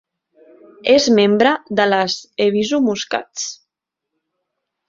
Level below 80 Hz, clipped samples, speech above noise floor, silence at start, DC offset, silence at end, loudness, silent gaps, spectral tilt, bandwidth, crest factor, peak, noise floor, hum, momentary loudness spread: -60 dBFS; under 0.1%; 65 dB; 0.85 s; under 0.1%; 1.35 s; -17 LUFS; none; -4 dB/octave; 7.6 kHz; 16 dB; -2 dBFS; -81 dBFS; none; 12 LU